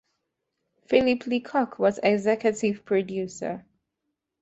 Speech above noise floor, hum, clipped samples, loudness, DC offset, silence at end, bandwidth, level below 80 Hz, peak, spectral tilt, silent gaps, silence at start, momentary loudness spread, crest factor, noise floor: 57 dB; none; under 0.1%; -25 LUFS; under 0.1%; 0.8 s; 8.2 kHz; -64 dBFS; -4 dBFS; -5.5 dB/octave; none; 0.9 s; 10 LU; 22 dB; -81 dBFS